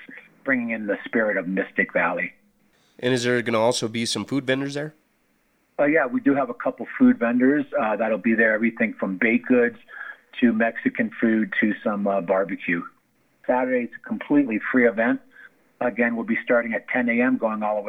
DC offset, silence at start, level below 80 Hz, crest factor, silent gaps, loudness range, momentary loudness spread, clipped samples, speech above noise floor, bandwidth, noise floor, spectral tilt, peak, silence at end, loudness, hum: under 0.1%; 0 s; -74 dBFS; 18 dB; none; 4 LU; 9 LU; under 0.1%; 44 dB; 11 kHz; -66 dBFS; -5 dB/octave; -6 dBFS; 0 s; -22 LUFS; none